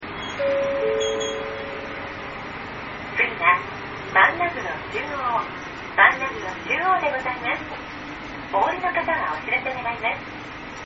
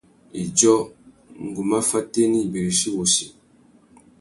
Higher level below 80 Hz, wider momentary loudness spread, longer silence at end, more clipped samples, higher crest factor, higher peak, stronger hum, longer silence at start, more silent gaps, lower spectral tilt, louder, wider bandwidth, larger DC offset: first, -50 dBFS vs -58 dBFS; second, 15 LU vs 18 LU; second, 0 s vs 0.9 s; neither; about the same, 24 dB vs 20 dB; about the same, -2 dBFS vs -4 dBFS; neither; second, 0 s vs 0.35 s; neither; second, -1.5 dB/octave vs -3.5 dB/octave; second, -23 LUFS vs -20 LUFS; second, 7.4 kHz vs 12 kHz; neither